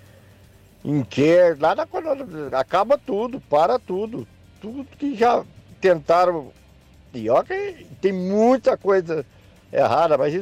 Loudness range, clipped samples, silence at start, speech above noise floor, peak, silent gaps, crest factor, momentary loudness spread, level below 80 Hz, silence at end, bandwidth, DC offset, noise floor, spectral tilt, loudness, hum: 3 LU; under 0.1%; 0.85 s; 30 dB; -8 dBFS; none; 12 dB; 14 LU; -56 dBFS; 0 s; 11 kHz; under 0.1%; -50 dBFS; -6.5 dB/octave; -21 LUFS; none